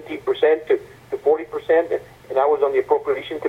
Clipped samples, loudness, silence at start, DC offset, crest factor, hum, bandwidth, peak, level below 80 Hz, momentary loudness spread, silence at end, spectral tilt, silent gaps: under 0.1%; -20 LUFS; 0 s; under 0.1%; 18 dB; none; 7 kHz; -2 dBFS; -58 dBFS; 7 LU; 0 s; -6 dB/octave; none